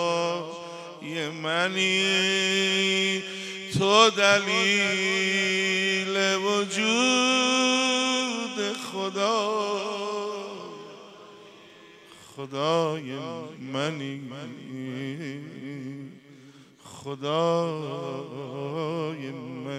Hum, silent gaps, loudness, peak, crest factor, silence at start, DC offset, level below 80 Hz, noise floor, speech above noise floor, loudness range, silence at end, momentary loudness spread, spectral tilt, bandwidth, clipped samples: none; none; -24 LUFS; -4 dBFS; 22 dB; 0 s; under 0.1%; -74 dBFS; -51 dBFS; 25 dB; 12 LU; 0 s; 18 LU; -3 dB/octave; 14 kHz; under 0.1%